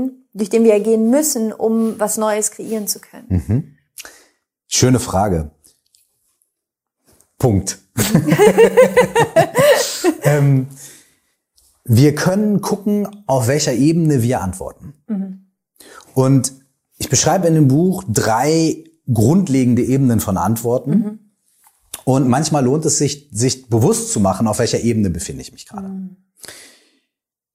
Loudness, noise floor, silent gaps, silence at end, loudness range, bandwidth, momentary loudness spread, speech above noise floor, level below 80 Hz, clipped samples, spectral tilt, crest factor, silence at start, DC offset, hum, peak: -16 LUFS; -80 dBFS; none; 0.95 s; 7 LU; 16 kHz; 16 LU; 65 dB; -46 dBFS; under 0.1%; -5.5 dB/octave; 16 dB; 0 s; under 0.1%; none; 0 dBFS